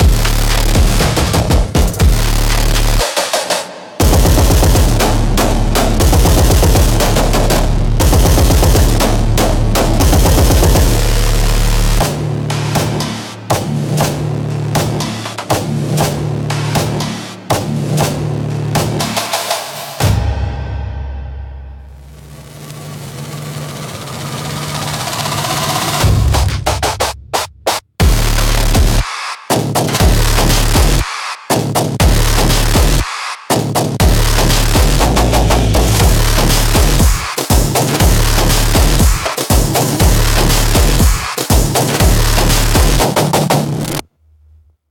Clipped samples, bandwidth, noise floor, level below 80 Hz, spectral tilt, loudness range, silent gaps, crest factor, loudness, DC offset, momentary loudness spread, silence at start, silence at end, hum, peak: under 0.1%; 17.5 kHz; -47 dBFS; -16 dBFS; -4.5 dB/octave; 7 LU; none; 12 dB; -13 LUFS; under 0.1%; 10 LU; 0 s; 0.9 s; none; 0 dBFS